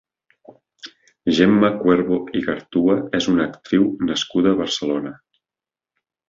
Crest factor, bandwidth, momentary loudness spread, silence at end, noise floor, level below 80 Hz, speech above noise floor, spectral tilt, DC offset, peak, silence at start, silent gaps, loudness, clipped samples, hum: 18 dB; 7.6 kHz; 15 LU; 1.15 s; under -90 dBFS; -54 dBFS; over 72 dB; -5.5 dB/octave; under 0.1%; -2 dBFS; 0.85 s; none; -19 LUFS; under 0.1%; none